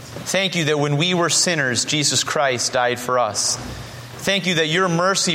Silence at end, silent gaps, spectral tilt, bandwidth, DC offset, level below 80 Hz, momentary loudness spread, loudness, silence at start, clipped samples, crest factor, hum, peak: 0 s; none; -3 dB/octave; 16.5 kHz; under 0.1%; -52 dBFS; 7 LU; -18 LUFS; 0 s; under 0.1%; 16 dB; none; -4 dBFS